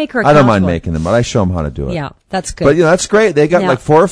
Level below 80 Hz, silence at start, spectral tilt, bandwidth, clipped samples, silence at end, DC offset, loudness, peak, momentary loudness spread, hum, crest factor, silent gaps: -32 dBFS; 0 s; -6 dB/octave; 11 kHz; 0.2%; 0 s; under 0.1%; -12 LUFS; 0 dBFS; 12 LU; none; 12 dB; none